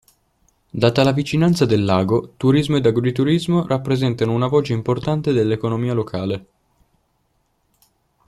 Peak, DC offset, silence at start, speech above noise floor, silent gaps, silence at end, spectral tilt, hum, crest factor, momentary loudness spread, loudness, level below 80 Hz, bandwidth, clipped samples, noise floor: -2 dBFS; under 0.1%; 0.75 s; 48 dB; none; 1.85 s; -7 dB/octave; none; 18 dB; 6 LU; -19 LUFS; -50 dBFS; 13.5 kHz; under 0.1%; -66 dBFS